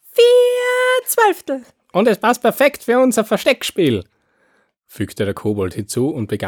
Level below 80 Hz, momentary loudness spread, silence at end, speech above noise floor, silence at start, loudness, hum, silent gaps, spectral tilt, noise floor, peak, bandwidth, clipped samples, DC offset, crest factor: -58 dBFS; 11 LU; 0 s; 43 dB; 0.15 s; -16 LUFS; none; none; -4.5 dB/octave; -61 dBFS; -2 dBFS; 19.5 kHz; under 0.1%; under 0.1%; 16 dB